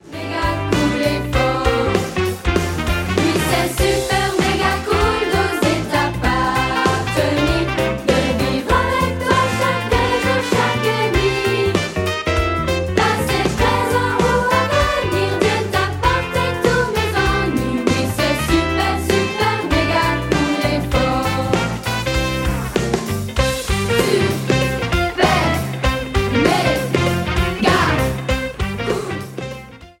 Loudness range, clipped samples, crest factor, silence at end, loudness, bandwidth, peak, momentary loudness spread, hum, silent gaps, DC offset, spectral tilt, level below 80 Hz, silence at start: 2 LU; under 0.1%; 16 dB; 0.1 s; -18 LUFS; 17 kHz; 0 dBFS; 4 LU; none; none; under 0.1%; -5 dB/octave; -28 dBFS; 0.05 s